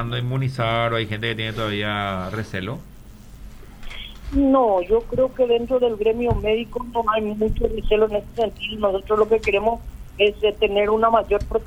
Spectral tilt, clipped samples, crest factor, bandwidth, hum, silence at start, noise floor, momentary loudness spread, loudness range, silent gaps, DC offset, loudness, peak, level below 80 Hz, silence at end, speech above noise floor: -7 dB/octave; under 0.1%; 16 dB; 15 kHz; none; 0 s; -41 dBFS; 10 LU; 5 LU; none; under 0.1%; -21 LUFS; -4 dBFS; -36 dBFS; 0 s; 20 dB